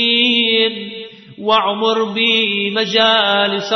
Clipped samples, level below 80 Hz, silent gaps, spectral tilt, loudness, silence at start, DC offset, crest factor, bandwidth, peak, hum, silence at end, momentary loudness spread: under 0.1%; -64 dBFS; none; -3.5 dB/octave; -14 LUFS; 0 s; under 0.1%; 14 dB; 6.2 kHz; -2 dBFS; none; 0 s; 15 LU